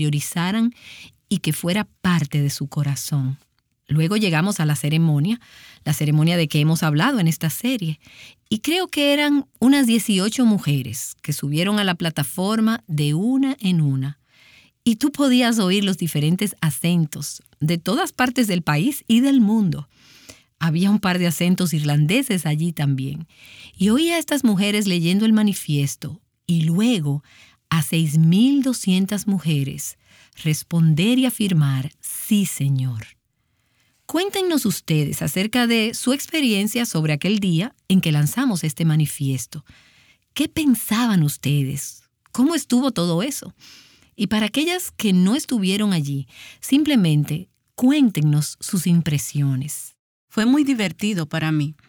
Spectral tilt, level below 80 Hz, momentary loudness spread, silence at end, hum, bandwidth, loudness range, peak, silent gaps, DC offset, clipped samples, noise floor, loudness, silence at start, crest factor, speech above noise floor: -5.5 dB/octave; -58 dBFS; 10 LU; 0.15 s; none; over 20 kHz; 3 LU; -6 dBFS; 49.99-50.28 s; under 0.1%; under 0.1%; -68 dBFS; -20 LUFS; 0 s; 14 dB; 49 dB